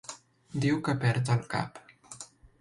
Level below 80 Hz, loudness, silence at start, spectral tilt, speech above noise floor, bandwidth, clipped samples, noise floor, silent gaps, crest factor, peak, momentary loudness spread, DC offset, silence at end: -62 dBFS; -30 LUFS; 0.1 s; -6 dB/octave; 21 dB; 11.5 kHz; under 0.1%; -49 dBFS; none; 18 dB; -14 dBFS; 20 LU; under 0.1%; 0.35 s